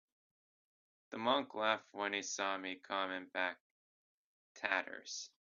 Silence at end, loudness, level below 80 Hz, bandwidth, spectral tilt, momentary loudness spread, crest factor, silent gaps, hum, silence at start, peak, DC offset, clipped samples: 0.15 s; -39 LUFS; -88 dBFS; 7.2 kHz; 0 dB/octave; 10 LU; 26 dB; 3.60-4.55 s; none; 1.1 s; -16 dBFS; under 0.1%; under 0.1%